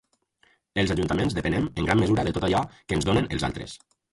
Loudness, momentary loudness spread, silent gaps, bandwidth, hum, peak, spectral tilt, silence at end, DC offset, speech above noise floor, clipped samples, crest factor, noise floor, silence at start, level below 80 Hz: -25 LUFS; 9 LU; none; 11.5 kHz; none; -6 dBFS; -6 dB/octave; 0.35 s; under 0.1%; 40 dB; under 0.1%; 20 dB; -65 dBFS; 0.75 s; -42 dBFS